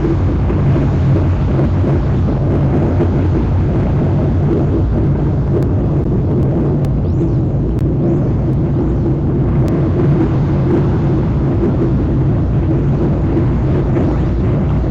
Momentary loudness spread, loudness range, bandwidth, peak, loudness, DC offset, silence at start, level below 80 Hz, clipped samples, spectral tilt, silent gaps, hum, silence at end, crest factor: 2 LU; 1 LU; 5.4 kHz; -4 dBFS; -14 LUFS; under 0.1%; 0 s; -22 dBFS; under 0.1%; -10.5 dB/octave; none; none; 0 s; 10 dB